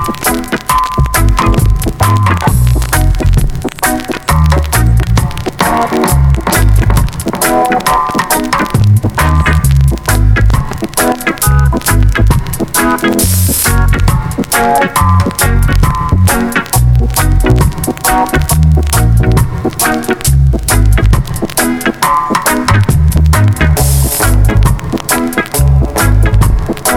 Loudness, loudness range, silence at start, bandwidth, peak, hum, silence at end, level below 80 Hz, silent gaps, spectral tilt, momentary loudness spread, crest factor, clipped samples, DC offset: -10 LUFS; 1 LU; 0 s; 20 kHz; 0 dBFS; none; 0 s; -14 dBFS; none; -5 dB/octave; 4 LU; 10 dB; 0.1%; under 0.1%